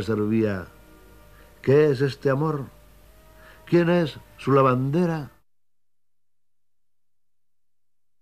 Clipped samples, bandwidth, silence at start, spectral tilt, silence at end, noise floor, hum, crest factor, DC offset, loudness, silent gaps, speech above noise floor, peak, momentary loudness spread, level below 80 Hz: under 0.1%; 14.5 kHz; 0 s; -8 dB/octave; 2.95 s; -89 dBFS; none; 20 dB; 0.1%; -23 LUFS; none; 67 dB; -6 dBFS; 14 LU; -56 dBFS